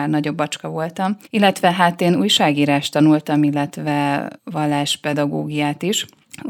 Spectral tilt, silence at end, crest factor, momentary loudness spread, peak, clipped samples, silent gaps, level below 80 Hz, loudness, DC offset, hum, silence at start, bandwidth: -5 dB/octave; 0 s; 18 dB; 9 LU; 0 dBFS; under 0.1%; none; -64 dBFS; -18 LUFS; under 0.1%; none; 0 s; 17 kHz